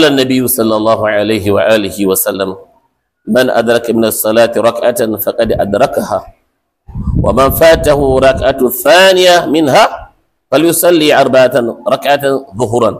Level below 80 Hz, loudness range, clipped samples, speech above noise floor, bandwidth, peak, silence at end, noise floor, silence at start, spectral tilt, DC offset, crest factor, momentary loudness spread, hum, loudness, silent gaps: -30 dBFS; 4 LU; under 0.1%; 52 dB; 16 kHz; 0 dBFS; 0 s; -62 dBFS; 0 s; -4 dB/octave; under 0.1%; 10 dB; 8 LU; none; -10 LUFS; none